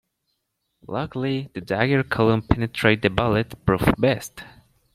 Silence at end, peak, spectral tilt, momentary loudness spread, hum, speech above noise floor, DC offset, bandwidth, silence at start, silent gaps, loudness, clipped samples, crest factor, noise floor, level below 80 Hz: 0.45 s; -2 dBFS; -6.5 dB/octave; 10 LU; none; 54 dB; under 0.1%; 15.5 kHz; 0.9 s; none; -22 LUFS; under 0.1%; 22 dB; -76 dBFS; -42 dBFS